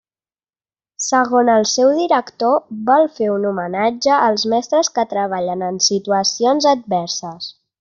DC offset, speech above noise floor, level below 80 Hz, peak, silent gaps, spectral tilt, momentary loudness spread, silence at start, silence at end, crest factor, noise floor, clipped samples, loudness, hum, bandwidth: under 0.1%; over 74 dB; -64 dBFS; -2 dBFS; none; -3 dB/octave; 7 LU; 1 s; 0.3 s; 16 dB; under -90 dBFS; under 0.1%; -16 LUFS; none; 8.2 kHz